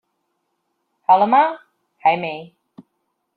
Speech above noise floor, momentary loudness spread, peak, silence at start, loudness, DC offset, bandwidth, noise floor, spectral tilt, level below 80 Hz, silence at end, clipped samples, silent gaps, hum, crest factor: 57 dB; 18 LU; -2 dBFS; 1.1 s; -18 LUFS; under 0.1%; 4.7 kHz; -73 dBFS; -8 dB/octave; -74 dBFS; 0.9 s; under 0.1%; none; none; 18 dB